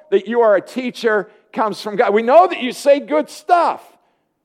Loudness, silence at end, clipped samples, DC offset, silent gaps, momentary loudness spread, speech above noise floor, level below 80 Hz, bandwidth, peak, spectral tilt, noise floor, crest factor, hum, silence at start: -16 LUFS; 0.7 s; under 0.1%; under 0.1%; none; 10 LU; 45 dB; -72 dBFS; 15 kHz; 0 dBFS; -4.5 dB/octave; -61 dBFS; 16 dB; none; 0.1 s